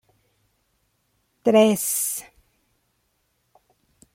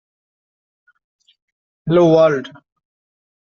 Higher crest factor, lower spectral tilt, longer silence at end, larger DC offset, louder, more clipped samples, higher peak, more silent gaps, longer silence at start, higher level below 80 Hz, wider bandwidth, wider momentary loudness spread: about the same, 22 dB vs 18 dB; second, -4 dB/octave vs -6.5 dB/octave; first, 1.95 s vs 0.95 s; neither; second, -20 LUFS vs -14 LUFS; neither; second, -6 dBFS vs -2 dBFS; neither; second, 1.45 s vs 1.85 s; second, -68 dBFS vs -60 dBFS; first, 16.5 kHz vs 6.8 kHz; second, 9 LU vs 20 LU